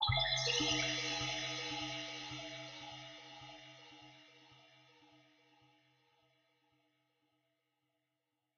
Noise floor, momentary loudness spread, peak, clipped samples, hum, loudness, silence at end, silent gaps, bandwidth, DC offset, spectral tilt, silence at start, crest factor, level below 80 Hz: -87 dBFS; 23 LU; -20 dBFS; under 0.1%; none; -37 LUFS; 3.4 s; none; 8.2 kHz; under 0.1%; -2.5 dB/octave; 0 s; 22 dB; -62 dBFS